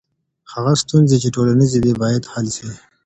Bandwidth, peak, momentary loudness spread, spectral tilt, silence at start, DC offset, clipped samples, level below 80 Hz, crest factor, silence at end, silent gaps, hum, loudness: 8.8 kHz; -2 dBFS; 12 LU; -6 dB/octave; 0.5 s; under 0.1%; under 0.1%; -46 dBFS; 16 dB; 0.3 s; none; none; -16 LUFS